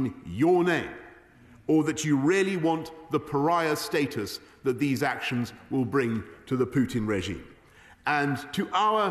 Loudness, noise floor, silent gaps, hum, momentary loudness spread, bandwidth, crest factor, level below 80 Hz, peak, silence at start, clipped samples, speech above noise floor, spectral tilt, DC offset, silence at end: -27 LUFS; -54 dBFS; none; none; 10 LU; 13.5 kHz; 14 dB; -58 dBFS; -14 dBFS; 0 s; under 0.1%; 28 dB; -5.5 dB/octave; under 0.1%; 0 s